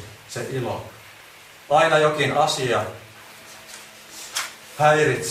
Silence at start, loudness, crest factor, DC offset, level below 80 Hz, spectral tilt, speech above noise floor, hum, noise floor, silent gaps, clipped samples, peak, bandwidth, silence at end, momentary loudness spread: 0 s; -21 LUFS; 20 dB; under 0.1%; -58 dBFS; -4 dB/octave; 26 dB; none; -46 dBFS; none; under 0.1%; -4 dBFS; 15.5 kHz; 0 s; 24 LU